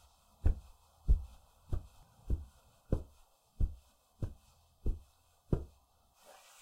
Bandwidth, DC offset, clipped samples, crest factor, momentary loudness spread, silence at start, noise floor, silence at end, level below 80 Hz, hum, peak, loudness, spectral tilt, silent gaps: 11.5 kHz; under 0.1%; under 0.1%; 20 dB; 22 LU; 0.45 s; -68 dBFS; 0.95 s; -40 dBFS; none; -18 dBFS; -41 LUFS; -8.5 dB/octave; none